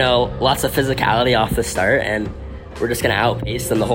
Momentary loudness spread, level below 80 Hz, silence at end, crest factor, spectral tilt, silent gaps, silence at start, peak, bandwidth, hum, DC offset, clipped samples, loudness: 8 LU; -34 dBFS; 0 s; 16 dB; -4.5 dB/octave; none; 0 s; -2 dBFS; 16.5 kHz; none; under 0.1%; under 0.1%; -18 LUFS